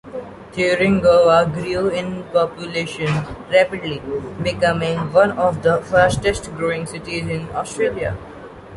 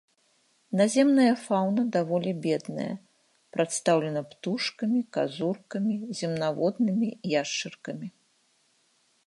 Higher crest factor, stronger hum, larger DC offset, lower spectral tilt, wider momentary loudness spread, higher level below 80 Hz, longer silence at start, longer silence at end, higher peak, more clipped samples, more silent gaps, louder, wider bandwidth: about the same, 16 dB vs 18 dB; neither; neither; about the same, -5.5 dB/octave vs -5 dB/octave; about the same, 12 LU vs 13 LU; first, -42 dBFS vs -78 dBFS; second, 0.05 s vs 0.7 s; second, 0 s vs 1.2 s; first, -2 dBFS vs -10 dBFS; neither; neither; first, -19 LUFS vs -27 LUFS; about the same, 11.5 kHz vs 11.5 kHz